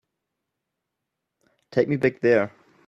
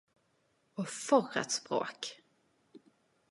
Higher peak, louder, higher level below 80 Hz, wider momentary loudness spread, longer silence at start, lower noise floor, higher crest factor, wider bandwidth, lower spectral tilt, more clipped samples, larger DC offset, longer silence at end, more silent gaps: first, -6 dBFS vs -12 dBFS; first, -23 LUFS vs -34 LUFS; first, -66 dBFS vs -88 dBFS; second, 8 LU vs 14 LU; first, 1.75 s vs 0.75 s; first, -82 dBFS vs -75 dBFS; about the same, 20 dB vs 24 dB; second, 7.6 kHz vs 11.5 kHz; first, -8 dB/octave vs -3 dB/octave; neither; neither; second, 0.4 s vs 1.15 s; neither